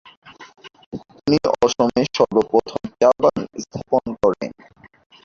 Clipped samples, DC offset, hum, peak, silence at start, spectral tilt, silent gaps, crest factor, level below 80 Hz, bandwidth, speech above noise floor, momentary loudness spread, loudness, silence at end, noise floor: under 0.1%; under 0.1%; none; -2 dBFS; 0.25 s; -5.5 dB/octave; 0.86-0.91 s; 18 dB; -52 dBFS; 7.6 kHz; 32 dB; 15 LU; -19 LUFS; 0.75 s; -49 dBFS